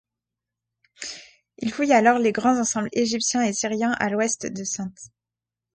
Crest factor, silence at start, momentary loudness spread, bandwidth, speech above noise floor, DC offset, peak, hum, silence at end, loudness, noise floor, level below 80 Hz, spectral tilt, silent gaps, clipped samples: 20 dB; 1 s; 17 LU; 9.6 kHz; 66 dB; under 0.1%; -6 dBFS; none; 0.7 s; -22 LUFS; -88 dBFS; -64 dBFS; -3 dB/octave; none; under 0.1%